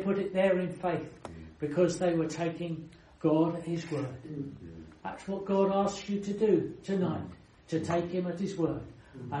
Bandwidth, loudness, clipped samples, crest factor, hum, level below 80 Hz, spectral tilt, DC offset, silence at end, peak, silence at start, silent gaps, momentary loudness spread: 11 kHz; -31 LUFS; under 0.1%; 18 dB; none; -60 dBFS; -7 dB/octave; under 0.1%; 0 s; -14 dBFS; 0 s; none; 16 LU